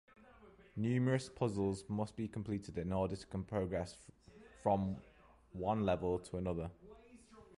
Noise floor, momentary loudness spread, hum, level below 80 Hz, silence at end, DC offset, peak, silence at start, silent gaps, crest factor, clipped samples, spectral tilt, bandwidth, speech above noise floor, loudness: -62 dBFS; 14 LU; none; -58 dBFS; 0.05 s; under 0.1%; -20 dBFS; 0.3 s; none; 18 dB; under 0.1%; -7.5 dB/octave; 11.5 kHz; 24 dB; -39 LUFS